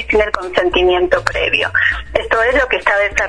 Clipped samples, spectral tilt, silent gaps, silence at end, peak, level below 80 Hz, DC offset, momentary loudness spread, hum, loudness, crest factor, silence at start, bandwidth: under 0.1%; -4 dB/octave; none; 0 s; 0 dBFS; -32 dBFS; under 0.1%; 4 LU; none; -14 LUFS; 14 dB; 0 s; 11 kHz